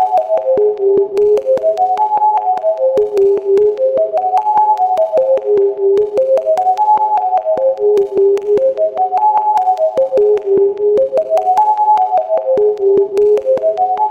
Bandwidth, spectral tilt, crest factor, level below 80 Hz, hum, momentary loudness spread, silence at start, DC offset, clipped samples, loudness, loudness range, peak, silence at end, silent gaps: 7.8 kHz; -6.5 dB/octave; 10 dB; -56 dBFS; none; 3 LU; 0 s; under 0.1%; under 0.1%; -13 LUFS; 1 LU; -2 dBFS; 0 s; none